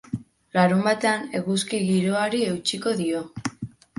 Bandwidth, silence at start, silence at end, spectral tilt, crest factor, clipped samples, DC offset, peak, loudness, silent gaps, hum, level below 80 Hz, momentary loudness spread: 11.5 kHz; 0.1 s; 0.3 s; -5 dB/octave; 18 dB; under 0.1%; under 0.1%; -6 dBFS; -24 LUFS; none; none; -60 dBFS; 13 LU